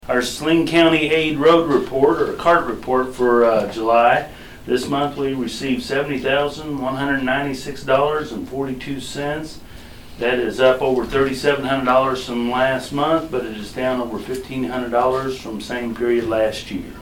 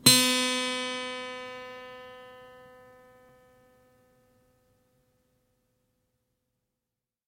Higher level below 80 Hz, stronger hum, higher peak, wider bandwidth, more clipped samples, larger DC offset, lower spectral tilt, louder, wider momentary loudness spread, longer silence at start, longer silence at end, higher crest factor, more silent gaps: first, -44 dBFS vs -68 dBFS; neither; first, 0 dBFS vs -4 dBFS; first, 18.5 kHz vs 16.5 kHz; neither; neither; first, -5 dB/octave vs -1.5 dB/octave; first, -19 LUFS vs -26 LUFS; second, 12 LU vs 27 LU; about the same, 0.05 s vs 0.05 s; second, 0 s vs 4.75 s; second, 18 dB vs 30 dB; neither